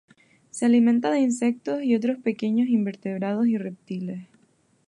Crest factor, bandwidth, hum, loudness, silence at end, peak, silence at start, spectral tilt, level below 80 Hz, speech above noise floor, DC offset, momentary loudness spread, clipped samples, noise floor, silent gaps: 14 dB; 11 kHz; none; -24 LUFS; 0.65 s; -10 dBFS; 0.55 s; -6 dB/octave; -76 dBFS; 40 dB; under 0.1%; 14 LU; under 0.1%; -63 dBFS; none